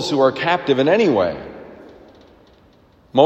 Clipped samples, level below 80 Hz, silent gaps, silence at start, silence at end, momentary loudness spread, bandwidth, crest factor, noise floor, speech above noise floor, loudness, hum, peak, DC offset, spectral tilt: under 0.1%; -56 dBFS; none; 0 s; 0 s; 19 LU; 8.6 kHz; 18 dB; -52 dBFS; 35 dB; -17 LUFS; none; 0 dBFS; under 0.1%; -5.5 dB/octave